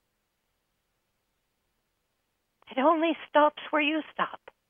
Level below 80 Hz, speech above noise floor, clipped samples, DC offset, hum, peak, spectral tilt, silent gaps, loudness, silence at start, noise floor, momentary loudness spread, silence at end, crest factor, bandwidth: -82 dBFS; 52 dB; under 0.1%; under 0.1%; none; -8 dBFS; -6.5 dB/octave; none; -27 LUFS; 2.7 s; -78 dBFS; 9 LU; 0.35 s; 22 dB; 3.7 kHz